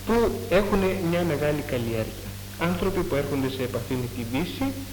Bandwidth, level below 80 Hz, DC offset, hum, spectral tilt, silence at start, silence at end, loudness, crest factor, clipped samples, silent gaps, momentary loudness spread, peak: 19 kHz; -40 dBFS; under 0.1%; none; -6 dB/octave; 0 s; 0 s; -26 LUFS; 18 dB; under 0.1%; none; 7 LU; -8 dBFS